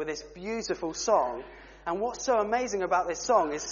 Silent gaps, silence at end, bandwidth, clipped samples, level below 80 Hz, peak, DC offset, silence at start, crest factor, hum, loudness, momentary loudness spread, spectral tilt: none; 0 s; 7.2 kHz; under 0.1%; -56 dBFS; -10 dBFS; under 0.1%; 0 s; 20 dB; none; -29 LUFS; 11 LU; -2.5 dB/octave